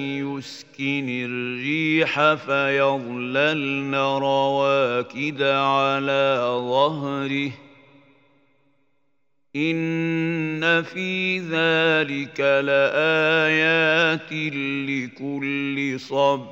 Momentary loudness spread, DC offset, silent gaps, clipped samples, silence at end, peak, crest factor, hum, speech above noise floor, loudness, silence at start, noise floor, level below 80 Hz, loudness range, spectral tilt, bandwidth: 9 LU; under 0.1%; none; under 0.1%; 0 s; -4 dBFS; 18 dB; none; 54 dB; -21 LUFS; 0 s; -75 dBFS; -74 dBFS; 7 LU; -5.5 dB/octave; 8 kHz